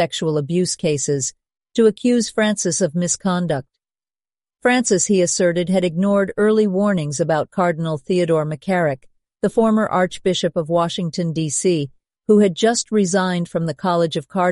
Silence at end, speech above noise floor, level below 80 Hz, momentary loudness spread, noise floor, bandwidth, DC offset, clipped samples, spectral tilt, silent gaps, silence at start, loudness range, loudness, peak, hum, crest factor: 0 s; over 72 dB; -56 dBFS; 7 LU; under -90 dBFS; 11.5 kHz; under 0.1%; under 0.1%; -5 dB/octave; none; 0 s; 2 LU; -19 LUFS; -4 dBFS; none; 16 dB